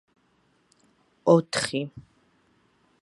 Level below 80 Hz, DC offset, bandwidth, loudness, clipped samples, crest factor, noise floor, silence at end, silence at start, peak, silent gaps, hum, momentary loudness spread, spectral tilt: -66 dBFS; under 0.1%; 11.5 kHz; -24 LUFS; under 0.1%; 24 dB; -67 dBFS; 1 s; 1.25 s; -4 dBFS; none; none; 12 LU; -5 dB/octave